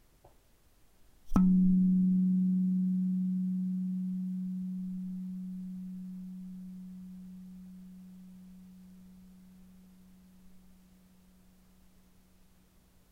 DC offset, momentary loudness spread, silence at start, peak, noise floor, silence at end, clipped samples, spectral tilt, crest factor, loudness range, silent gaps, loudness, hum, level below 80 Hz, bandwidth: under 0.1%; 26 LU; 1.25 s; -14 dBFS; -64 dBFS; 2.55 s; under 0.1%; -10.5 dB/octave; 20 dB; 23 LU; none; -31 LUFS; none; -52 dBFS; 1.7 kHz